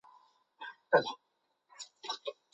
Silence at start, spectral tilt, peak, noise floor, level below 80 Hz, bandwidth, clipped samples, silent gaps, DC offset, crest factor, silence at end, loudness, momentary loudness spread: 0.6 s; -3 dB/octave; -12 dBFS; -76 dBFS; -84 dBFS; 8.2 kHz; under 0.1%; none; under 0.1%; 26 dB; 0.2 s; -34 LUFS; 20 LU